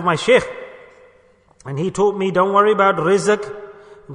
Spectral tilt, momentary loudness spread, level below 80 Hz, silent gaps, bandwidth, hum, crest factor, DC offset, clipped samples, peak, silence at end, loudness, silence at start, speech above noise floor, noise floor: -5 dB/octave; 18 LU; -54 dBFS; none; 10.5 kHz; none; 16 dB; under 0.1%; under 0.1%; -2 dBFS; 0 s; -16 LUFS; 0 s; 37 dB; -53 dBFS